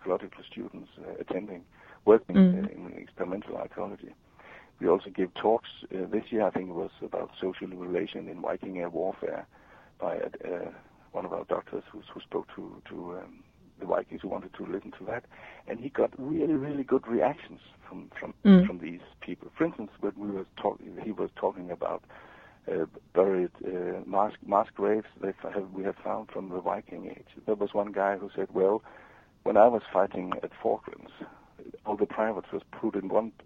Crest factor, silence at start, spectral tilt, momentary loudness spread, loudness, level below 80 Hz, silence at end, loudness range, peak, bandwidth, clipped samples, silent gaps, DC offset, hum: 24 dB; 0 s; -9.5 dB/octave; 18 LU; -30 LUFS; -62 dBFS; 0.15 s; 9 LU; -6 dBFS; 4.3 kHz; under 0.1%; none; under 0.1%; none